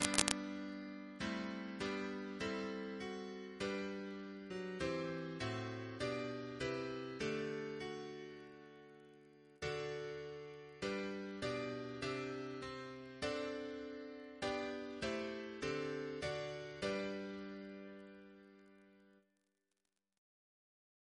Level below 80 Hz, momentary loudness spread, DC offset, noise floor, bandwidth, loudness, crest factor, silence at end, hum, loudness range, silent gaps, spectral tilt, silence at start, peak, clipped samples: -68 dBFS; 12 LU; under 0.1%; -89 dBFS; 11 kHz; -44 LUFS; 38 dB; 2 s; none; 5 LU; none; -4 dB/octave; 0 s; -6 dBFS; under 0.1%